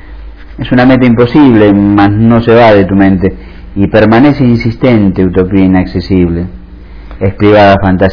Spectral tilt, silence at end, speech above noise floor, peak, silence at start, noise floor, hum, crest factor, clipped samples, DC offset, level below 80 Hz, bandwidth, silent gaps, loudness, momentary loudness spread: -9.5 dB/octave; 0 s; 22 dB; 0 dBFS; 0 s; -27 dBFS; none; 6 dB; 6%; under 0.1%; -26 dBFS; 5.4 kHz; none; -7 LUFS; 10 LU